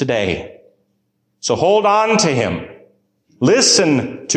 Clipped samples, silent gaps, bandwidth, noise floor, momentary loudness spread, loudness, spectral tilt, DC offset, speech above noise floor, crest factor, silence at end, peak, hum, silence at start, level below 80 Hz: under 0.1%; none; 13 kHz; -67 dBFS; 12 LU; -15 LUFS; -3.5 dB/octave; under 0.1%; 52 dB; 14 dB; 0 s; -2 dBFS; none; 0 s; -46 dBFS